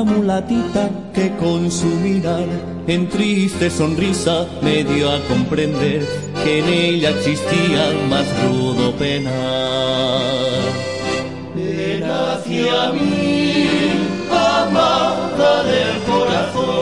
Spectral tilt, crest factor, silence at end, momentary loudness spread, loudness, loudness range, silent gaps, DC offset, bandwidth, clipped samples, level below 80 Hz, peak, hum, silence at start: -5.5 dB/octave; 16 dB; 0 s; 6 LU; -17 LUFS; 3 LU; none; 0.5%; 11.5 kHz; under 0.1%; -46 dBFS; -2 dBFS; none; 0 s